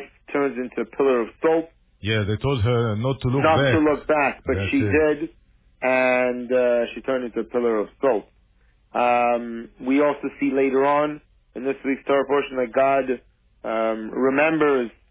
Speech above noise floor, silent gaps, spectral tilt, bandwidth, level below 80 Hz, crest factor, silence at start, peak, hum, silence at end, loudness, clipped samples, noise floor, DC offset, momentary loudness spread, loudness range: 38 dB; none; -10.5 dB/octave; 4 kHz; -46 dBFS; 16 dB; 0 s; -6 dBFS; none; 0.2 s; -22 LUFS; under 0.1%; -59 dBFS; under 0.1%; 10 LU; 3 LU